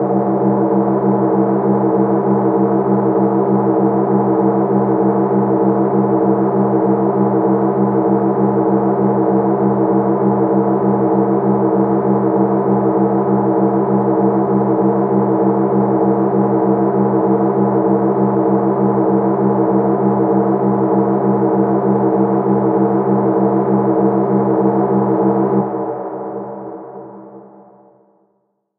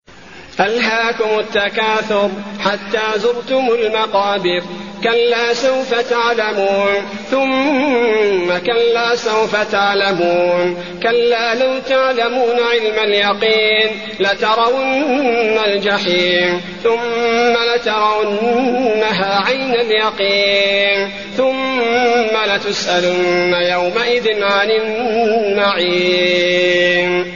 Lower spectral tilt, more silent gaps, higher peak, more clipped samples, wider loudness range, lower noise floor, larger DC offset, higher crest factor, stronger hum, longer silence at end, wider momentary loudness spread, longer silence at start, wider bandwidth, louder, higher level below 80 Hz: first, -14.5 dB/octave vs -1 dB/octave; neither; about the same, -2 dBFS vs 0 dBFS; neither; about the same, 1 LU vs 2 LU; first, -65 dBFS vs -38 dBFS; second, under 0.1% vs 0.6%; about the same, 12 dB vs 14 dB; neither; first, 1.4 s vs 0 s; second, 1 LU vs 5 LU; about the same, 0 s vs 0.1 s; second, 2.6 kHz vs 7.4 kHz; about the same, -14 LUFS vs -14 LUFS; about the same, -56 dBFS vs -54 dBFS